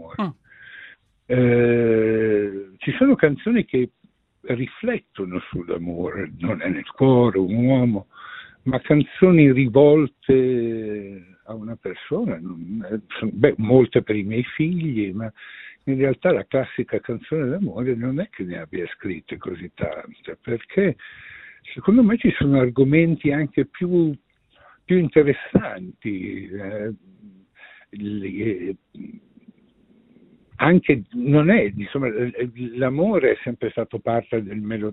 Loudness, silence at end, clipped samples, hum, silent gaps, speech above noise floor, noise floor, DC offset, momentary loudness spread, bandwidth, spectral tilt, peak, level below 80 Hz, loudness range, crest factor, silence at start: -21 LUFS; 0 s; under 0.1%; none; none; 37 dB; -57 dBFS; under 0.1%; 17 LU; 4.1 kHz; -12 dB/octave; -2 dBFS; -52 dBFS; 10 LU; 20 dB; 0 s